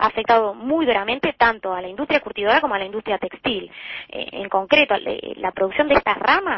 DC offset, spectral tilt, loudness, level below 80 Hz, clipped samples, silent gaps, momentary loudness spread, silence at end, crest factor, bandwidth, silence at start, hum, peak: under 0.1%; -6 dB/octave; -20 LUFS; -50 dBFS; under 0.1%; none; 11 LU; 0 s; 18 dB; 6 kHz; 0 s; none; -2 dBFS